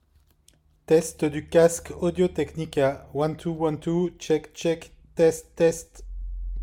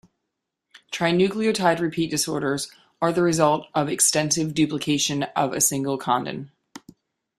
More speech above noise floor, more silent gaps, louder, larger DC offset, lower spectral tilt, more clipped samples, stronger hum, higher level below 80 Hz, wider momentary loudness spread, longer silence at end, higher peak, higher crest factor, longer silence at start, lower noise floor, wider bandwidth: second, 37 dB vs 59 dB; neither; second, -25 LUFS vs -22 LUFS; neither; first, -6 dB/octave vs -3.5 dB/octave; neither; neither; first, -42 dBFS vs -60 dBFS; first, 15 LU vs 8 LU; second, 0 s vs 0.6 s; about the same, -6 dBFS vs -4 dBFS; about the same, 18 dB vs 20 dB; about the same, 0.9 s vs 0.9 s; second, -61 dBFS vs -81 dBFS; about the same, 16.5 kHz vs 15 kHz